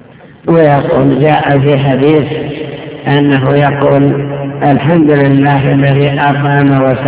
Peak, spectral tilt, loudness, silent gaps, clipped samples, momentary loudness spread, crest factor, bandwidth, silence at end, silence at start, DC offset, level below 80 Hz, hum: 0 dBFS; -11.5 dB/octave; -9 LUFS; none; 2%; 10 LU; 8 dB; 4 kHz; 0 s; 0.25 s; 0.2%; -40 dBFS; none